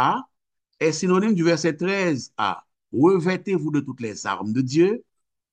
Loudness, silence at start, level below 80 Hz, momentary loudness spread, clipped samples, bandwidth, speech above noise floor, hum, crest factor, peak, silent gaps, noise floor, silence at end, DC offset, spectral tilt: -22 LUFS; 0 s; -70 dBFS; 10 LU; under 0.1%; 9 kHz; 55 dB; none; 16 dB; -6 dBFS; none; -77 dBFS; 0.55 s; under 0.1%; -6 dB/octave